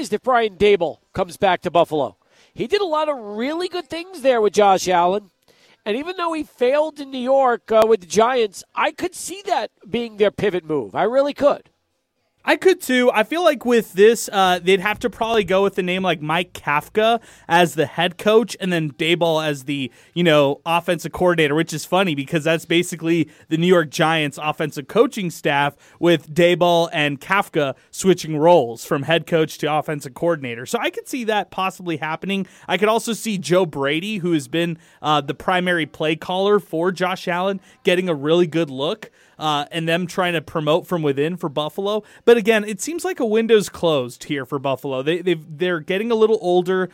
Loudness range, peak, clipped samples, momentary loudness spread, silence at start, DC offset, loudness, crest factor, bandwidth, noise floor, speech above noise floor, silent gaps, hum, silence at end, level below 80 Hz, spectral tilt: 4 LU; -2 dBFS; under 0.1%; 9 LU; 0 s; under 0.1%; -19 LUFS; 16 dB; 16.5 kHz; -70 dBFS; 51 dB; none; none; 0.05 s; -56 dBFS; -5 dB/octave